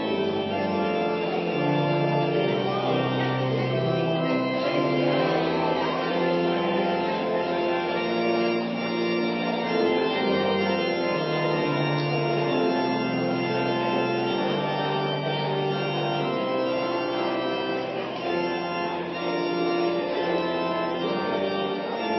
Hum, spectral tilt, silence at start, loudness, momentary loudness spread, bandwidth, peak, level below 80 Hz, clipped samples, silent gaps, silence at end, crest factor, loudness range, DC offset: none; -7.5 dB/octave; 0 s; -25 LUFS; 3 LU; 6 kHz; -12 dBFS; -62 dBFS; under 0.1%; none; 0 s; 14 dB; 2 LU; under 0.1%